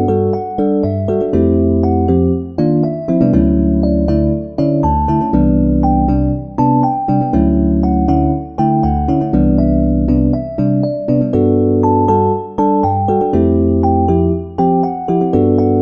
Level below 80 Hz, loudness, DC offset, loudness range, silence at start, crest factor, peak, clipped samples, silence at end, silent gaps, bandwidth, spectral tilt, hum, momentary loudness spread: -24 dBFS; -14 LUFS; 0.3%; 1 LU; 0 s; 12 dB; 0 dBFS; under 0.1%; 0 s; none; 6.2 kHz; -12 dB/octave; none; 4 LU